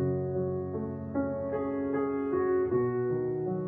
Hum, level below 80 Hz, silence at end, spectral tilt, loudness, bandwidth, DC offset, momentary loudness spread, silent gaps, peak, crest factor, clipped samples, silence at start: none; -60 dBFS; 0 s; -12.5 dB/octave; -31 LUFS; 3.1 kHz; under 0.1%; 6 LU; none; -18 dBFS; 14 dB; under 0.1%; 0 s